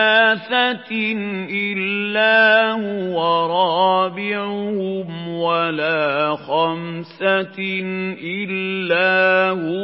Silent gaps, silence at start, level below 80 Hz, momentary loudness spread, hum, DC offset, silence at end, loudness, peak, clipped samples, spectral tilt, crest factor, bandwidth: none; 0 s; -78 dBFS; 10 LU; none; under 0.1%; 0 s; -18 LUFS; -2 dBFS; under 0.1%; -10 dB/octave; 16 dB; 5.8 kHz